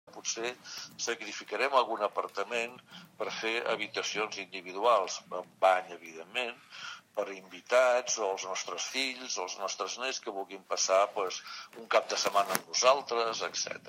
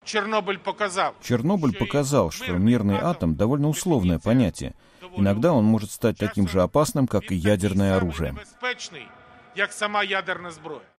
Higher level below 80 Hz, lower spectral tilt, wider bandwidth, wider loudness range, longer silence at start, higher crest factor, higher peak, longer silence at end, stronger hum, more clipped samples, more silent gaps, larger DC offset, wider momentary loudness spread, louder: second, -90 dBFS vs -44 dBFS; second, -0.5 dB/octave vs -6 dB/octave; about the same, 16 kHz vs 15.5 kHz; about the same, 3 LU vs 3 LU; about the same, 0.05 s vs 0.05 s; first, 30 dB vs 18 dB; about the same, -4 dBFS vs -6 dBFS; second, 0 s vs 0.2 s; neither; neither; neither; neither; first, 14 LU vs 11 LU; second, -31 LUFS vs -23 LUFS